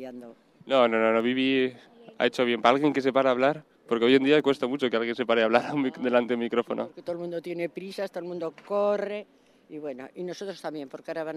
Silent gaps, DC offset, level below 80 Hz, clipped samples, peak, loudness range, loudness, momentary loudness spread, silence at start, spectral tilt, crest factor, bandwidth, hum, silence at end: none; under 0.1%; -74 dBFS; under 0.1%; -4 dBFS; 9 LU; -26 LUFS; 15 LU; 0 s; -5.5 dB/octave; 22 dB; 12 kHz; none; 0 s